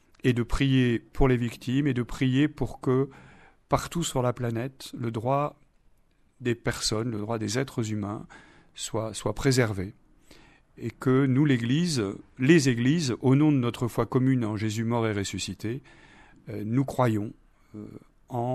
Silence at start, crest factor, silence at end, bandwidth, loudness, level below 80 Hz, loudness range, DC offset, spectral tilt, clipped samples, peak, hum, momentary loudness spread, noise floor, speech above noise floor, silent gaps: 0.25 s; 22 dB; 0 s; 13.5 kHz; -27 LUFS; -44 dBFS; 7 LU; under 0.1%; -6 dB/octave; under 0.1%; -6 dBFS; none; 13 LU; -63 dBFS; 37 dB; none